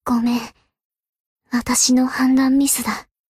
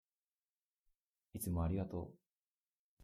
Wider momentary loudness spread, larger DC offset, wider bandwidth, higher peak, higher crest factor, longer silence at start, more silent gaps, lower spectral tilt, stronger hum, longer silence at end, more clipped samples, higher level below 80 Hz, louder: second, 11 LU vs 16 LU; neither; about the same, 15.5 kHz vs 15.5 kHz; first, -4 dBFS vs -28 dBFS; about the same, 16 dB vs 18 dB; second, 0.05 s vs 1.35 s; second, 0.84-0.90 s, 1.09-1.13 s, 1.20-1.36 s vs 2.26-2.97 s; second, -2 dB/octave vs -7.5 dB/octave; neither; first, 0.3 s vs 0 s; neither; first, -50 dBFS vs -56 dBFS; first, -17 LUFS vs -42 LUFS